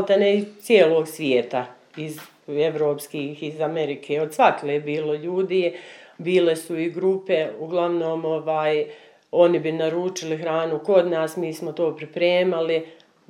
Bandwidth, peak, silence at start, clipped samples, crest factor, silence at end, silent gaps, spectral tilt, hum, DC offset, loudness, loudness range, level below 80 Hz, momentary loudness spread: 16.5 kHz; -2 dBFS; 0 s; under 0.1%; 20 dB; 0.35 s; none; -5.5 dB/octave; none; under 0.1%; -22 LUFS; 2 LU; -82 dBFS; 12 LU